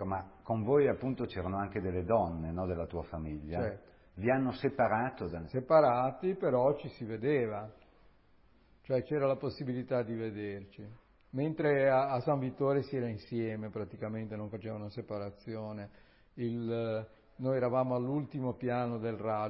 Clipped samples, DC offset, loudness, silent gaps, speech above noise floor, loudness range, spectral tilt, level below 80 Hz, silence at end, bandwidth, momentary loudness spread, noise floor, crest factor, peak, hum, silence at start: under 0.1%; under 0.1%; -34 LUFS; none; 31 dB; 9 LU; -7 dB/octave; -56 dBFS; 0 s; 5.6 kHz; 13 LU; -64 dBFS; 20 dB; -14 dBFS; none; 0 s